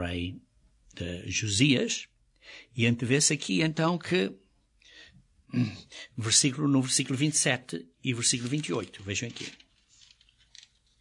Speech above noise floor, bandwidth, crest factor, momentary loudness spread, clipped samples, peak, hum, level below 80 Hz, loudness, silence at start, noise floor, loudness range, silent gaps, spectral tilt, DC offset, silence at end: 33 dB; 11 kHz; 22 dB; 17 LU; under 0.1%; -8 dBFS; none; -64 dBFS; -27 LUFS; 0 s; -62 dBFS; 4 LU; none; -3.5 dB/octave; under 0.1%; 1.45 s